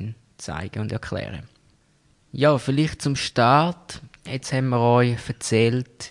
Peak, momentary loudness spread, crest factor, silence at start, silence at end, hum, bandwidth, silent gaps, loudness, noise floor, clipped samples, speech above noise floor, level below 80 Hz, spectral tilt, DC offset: -4 dBFS; 19 LU; 18 dB; 0 s; 0 s; none; 11.5 kHz; none; -22 LUFS; -61 dBFS; under 0.1%; 39 dB; -52 dBFS; -5.5 dB/octave; under 0.1%